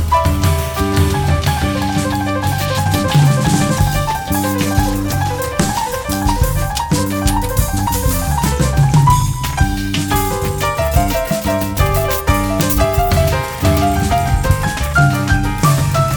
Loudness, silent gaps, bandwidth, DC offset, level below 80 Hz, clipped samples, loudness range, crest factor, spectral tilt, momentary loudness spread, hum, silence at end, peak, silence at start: -15 LUFS; none; 19.5 kHz; 0.2%; -22 dBFS; under 0.1%; 2 LU; 14 dB; -5 dB/octave; 5 LU; none; 0 s; 0 dBFS; 0 s